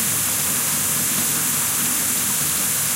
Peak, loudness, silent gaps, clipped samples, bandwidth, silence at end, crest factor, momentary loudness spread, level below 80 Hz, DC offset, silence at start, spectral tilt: -8 dBFS; -18 LUFS; none; under 0.1%; 16 kHz; 0 s; 14 dB; 0 LU; -52 dBFS; under 0.1%; 0 s; -1 dB/octave